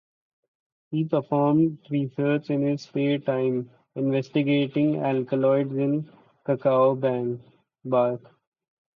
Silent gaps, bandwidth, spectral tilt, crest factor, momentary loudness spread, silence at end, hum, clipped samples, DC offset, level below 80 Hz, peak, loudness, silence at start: none; 6.6 kHz; -9 dB/octave; 16 dB; 10 LU; 0.8 s; none; under 0.1%; under 0.1%; -72 dBFS; -10 dBFS; -25 LUFS; 0.9 s